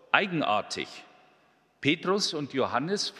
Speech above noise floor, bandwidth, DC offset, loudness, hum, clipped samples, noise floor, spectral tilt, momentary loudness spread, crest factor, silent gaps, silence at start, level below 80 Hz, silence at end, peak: 36 dB; 13.5 kHz; under 0.1%; -28 LUFS; none; under 0.1%; -65 dBFS; -3.5 dB/octave; 10 LU; 26 dB; none; 0.15 s; -70 dBFS; 0 s; -2 dBFS